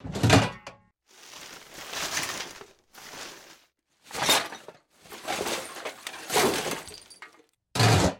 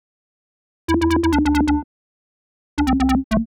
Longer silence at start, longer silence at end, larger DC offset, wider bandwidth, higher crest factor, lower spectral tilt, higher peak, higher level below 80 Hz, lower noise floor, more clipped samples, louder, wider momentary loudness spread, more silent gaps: second, 0.05 s vs 0.9 s; about the same, 0 s vs 0.05 s; neither; about the same, 17.5 kHz vs 18 kHz; first, 24 dB vs 12 dB; second, -3.5 dB/octave vs -6 dB/octave; first, -4 dBFS vs -8 dBFS; second, -50 dBFS vs -30 dBFS; second, -64 dBFS vs under -90 dBFS; neither; second, -26 LUFS vs -19 LUFS; first, 25 LU vs 7 LU; second, none vs 1.84-2.77 s, 3.24-3.30 s